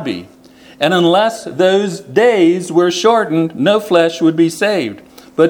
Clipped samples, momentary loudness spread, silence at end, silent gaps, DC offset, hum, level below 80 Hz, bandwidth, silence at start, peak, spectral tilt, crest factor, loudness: under 0.1%; 7 LU; 0 s; none; under 0.1%; none; -60 dBFS; 17.5 kHz; 0 s; 0 dBFS; -5 dB/octave; 14 dB; -13 LUFS